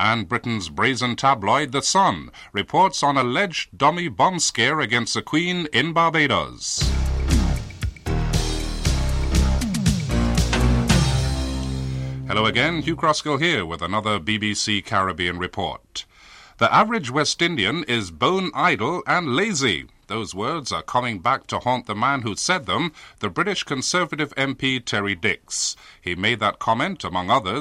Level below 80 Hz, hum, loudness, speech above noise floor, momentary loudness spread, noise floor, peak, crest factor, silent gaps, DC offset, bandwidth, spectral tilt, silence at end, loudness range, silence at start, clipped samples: -30 dBFS; none; -21 LUFS; 26 dB; 8 LU; -47 dBFS; -6 dBFS; 16 dB; none; under 0.1%; 15.5 kHz; -4 dB/octave; 0 s; 3 LU; 0 s; under 0.1%